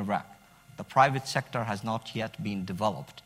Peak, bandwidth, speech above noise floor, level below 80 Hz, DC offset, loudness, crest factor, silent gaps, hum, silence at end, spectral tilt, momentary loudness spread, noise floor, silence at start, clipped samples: -8 dBFS; 16 kHz; 25 dB; -66 dBFS; under 0.1%; -30 LUFS; 22 dB; none; none; 0.05 s; -5.5 dB/octave; 11 LU; -54 dBFS; 0 s; under 0.1%